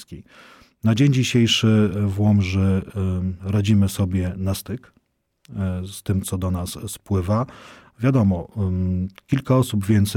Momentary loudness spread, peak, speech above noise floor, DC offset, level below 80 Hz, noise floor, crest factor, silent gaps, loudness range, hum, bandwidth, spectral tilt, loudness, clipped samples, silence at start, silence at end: 11 LU; -8 dBFS; 42 dB; under 0.1%; -46 dBFS; -62 dBFS; 14 dB; none; 7 LU; none; 16.5 kHz; -6 dB/octave; -21 LUFS; under 0.1%; 0 s; 0 s